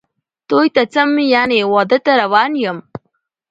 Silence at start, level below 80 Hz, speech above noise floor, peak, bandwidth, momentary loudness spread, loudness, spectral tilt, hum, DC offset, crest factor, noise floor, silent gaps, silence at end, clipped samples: 0.5 s; -62 dBFS; 55 dB; 0 dBFS; 8 kHz; 6 LU; -14 LUFS; -5.5 dB/octave; none; under 0.1%; 14 dB; -68 dBFS; none; 0.7 s; under 0.1%